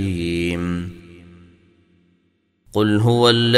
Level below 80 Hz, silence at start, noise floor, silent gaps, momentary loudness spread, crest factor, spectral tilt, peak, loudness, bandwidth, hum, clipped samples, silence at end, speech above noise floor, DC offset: -46 dBFS; 0 s; -65 dBFS; none; 16 LU; 20 dB; -6 dB/octave; 0 dBFS; -19 LUFS; 14 kHz; none; under 0.1%; 0 s; 49 dB; under 0.1%